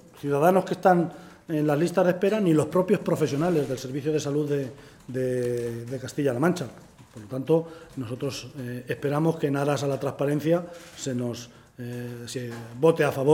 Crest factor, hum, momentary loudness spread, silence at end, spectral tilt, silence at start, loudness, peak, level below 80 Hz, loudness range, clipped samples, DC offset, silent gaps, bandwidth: 20 dB; none; 15 LU; 0 s; -6.5 dB/octave; 0.05 s; -26 LUFS; -6 dBFS; -62 dBFS; 6 LU; under 0.1%; under 0.1%; none; 17 kHz